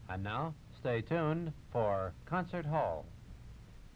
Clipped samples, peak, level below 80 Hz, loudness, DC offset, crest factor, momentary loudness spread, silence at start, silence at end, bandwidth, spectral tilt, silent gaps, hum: under 0.1%; -22 dBFS; -56 dBFS; -37 LUFS; under 0.1%; 16 dB; 20 LU; 0 s; 0 s; 9.4 kHz; -8.5 dB/octave; none; none